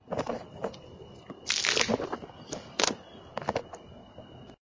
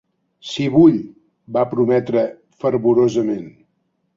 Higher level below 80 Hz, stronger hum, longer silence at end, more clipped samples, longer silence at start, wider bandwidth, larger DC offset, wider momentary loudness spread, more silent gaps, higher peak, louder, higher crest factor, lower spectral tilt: about the same, -60 dBFS vs -56 dBFS; neither; second, 0.1 s vs 0.65 s; neither; second, 0.05 s vs 0.45 s; about the same, 7.8 kHz vs 7.6 kHz; neither; first, 23 LU vs 15 LU; neither; about the same, -4 dBFS vs -2 dBFS; second, -31 LUFS vs -17 LUFS; first, 30 dB vs 16 dB; second, -2 dB/octave vs -7.5 dB/octave